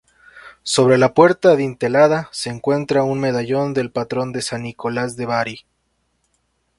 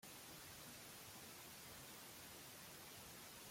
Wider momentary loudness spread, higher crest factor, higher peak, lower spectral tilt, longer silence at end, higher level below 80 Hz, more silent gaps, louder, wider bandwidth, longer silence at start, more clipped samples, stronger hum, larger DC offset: first, 12 LU vs 0 LU; first, 18 dB vs 12 dB; first, 0 dBFS vs -46 dBFS; first, -5 dB/octave vs -2 dB/octave; first, 1.2 s vs 0 s; first, -56 dBFS vs -78 dBFS; neither; first, -18 LUFS vs -56 LUFS; second, 11.5 kHz vs 16.5 kHz; first, 0.35 s vs 0 s; neither; neither; neither